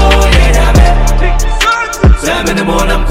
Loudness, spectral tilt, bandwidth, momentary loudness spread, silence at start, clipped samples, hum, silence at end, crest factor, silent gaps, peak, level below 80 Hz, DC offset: -10 LUFS; -4.5 dB/octave; 16 kHz; 5 LU; 0 s; 2%; none; 0 s; 8 dB; none; 0 dBFS; -10 dBFS; under 0.1%